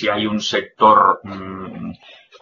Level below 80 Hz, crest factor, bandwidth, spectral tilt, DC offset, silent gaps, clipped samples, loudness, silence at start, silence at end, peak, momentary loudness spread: -56 dBFS; 18 dB; 7.4 kHz; -2.5 dB/octave; under 0.1%; none; under 0.1%; -15 LUFS; 0 s; 0.3 s; 0 dBFS; 19 LU